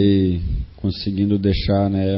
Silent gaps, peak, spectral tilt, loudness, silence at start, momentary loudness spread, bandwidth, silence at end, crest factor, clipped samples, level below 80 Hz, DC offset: none; -6 dBFS; -12.5 dB/octave; -20 LUFS; 0 s; 7 LU; 5.8 kHz; 0 s; 14 dB; under 0.1%; -30 dBFS; under 0.1%